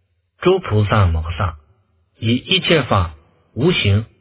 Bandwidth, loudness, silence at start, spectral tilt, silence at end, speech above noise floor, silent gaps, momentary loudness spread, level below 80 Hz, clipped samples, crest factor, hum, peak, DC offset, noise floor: 4 kHz; -17 LUFS; 0.4 s; -10.5 dB/octave; 0.15 s; 42 dB; none; 10 LU; -30 dBFS; under 0.1%; 18 dB; none; 0 dBFS; under 0.1%; -58 dBFS